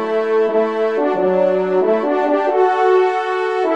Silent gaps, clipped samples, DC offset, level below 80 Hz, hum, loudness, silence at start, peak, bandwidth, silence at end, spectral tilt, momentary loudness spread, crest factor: none; under 0.1%; 0.3%; -68 dBFS; none; -16 LUFS; 0 s; -4 dBFS; 7.8 kHz; 0 s; -6.5 dB/octave; 4 LU; 12 dB